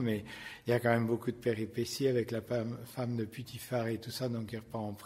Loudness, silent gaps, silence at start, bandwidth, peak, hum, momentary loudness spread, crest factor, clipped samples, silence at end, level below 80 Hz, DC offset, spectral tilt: -35 LUFS; none; 0 s; 16 kHz; -14 dBFS; none; 10 LU; 22 dB; under 0.1%; 0 s; -66 dBFS; under 0.1%; -6 dB/octave